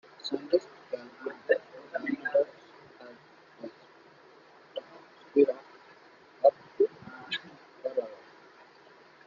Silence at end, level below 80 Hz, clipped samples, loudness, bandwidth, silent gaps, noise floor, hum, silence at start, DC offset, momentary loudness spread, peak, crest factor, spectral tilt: 1.1 s; -82 dBFS; under 0.1%; -31 LUFS; 7.4 kHz; none; -56 dBFS; none; 0.25 s; under 0.1%; 25 LU; -8 dBFS; 24 dB; -5 dB/octave